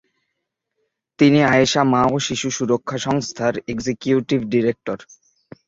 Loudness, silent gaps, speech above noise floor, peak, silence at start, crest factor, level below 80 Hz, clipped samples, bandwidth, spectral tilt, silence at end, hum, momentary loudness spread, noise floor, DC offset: -19 LUFS; none; 59 dB; -2 dBFS; 1.2 s; 18 dB; -54 dBFS; under 0.1%; 7.8 kHz; -5 dB/octave; 0.65 s; none; 11 LU; -78 dBFS; under 0.1%